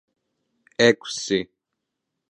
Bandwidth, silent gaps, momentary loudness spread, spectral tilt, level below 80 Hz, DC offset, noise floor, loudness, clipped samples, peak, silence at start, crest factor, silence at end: 11 kHz; none; 18 LU; -3.5 dB/octave; -66 dBFS; under 0.1%; -81 dBFS; -21 LUFS; under 0.1%; -2 dBFS; 0.8 s; 24 dB; 0.85 s